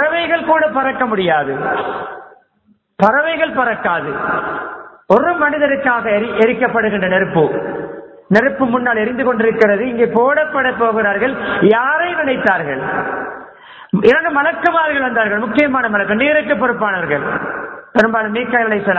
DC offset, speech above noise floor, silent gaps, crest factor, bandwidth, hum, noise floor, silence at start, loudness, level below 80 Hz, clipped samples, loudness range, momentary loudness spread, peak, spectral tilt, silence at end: under 0.1%; 42 dB; none; 16 dB; 8 kHz; none; -57 dBFS; 0 s; -15 LUFS; -50 dBFS; under 0.1%; 3 LU; 9 LU; 0 dBFS; -7.5 dB/octave; 0 s